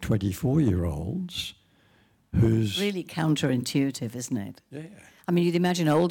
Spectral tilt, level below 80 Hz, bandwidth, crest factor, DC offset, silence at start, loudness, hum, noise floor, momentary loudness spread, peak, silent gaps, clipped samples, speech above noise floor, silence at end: -6 dB/octave; -48 dBFS; 18 kHz; 12 dB; under 0.1%; 0 s; -26 LUFS; none; -62 dBFS; 15 LU; -14 dBFS; none; under 0.1%; 37 dB; 0 s